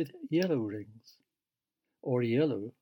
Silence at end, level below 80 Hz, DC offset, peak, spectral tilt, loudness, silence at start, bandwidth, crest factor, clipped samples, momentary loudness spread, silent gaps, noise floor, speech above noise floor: 0.1 s; -84 dBFS; under 0.1%; -16 dBFS; -8 dB/octave; -31 LUFS; 0 s; 19 kHz; 16 dB; under 0.1%; 14 LU; none; under -90 dBFS; over 58 dB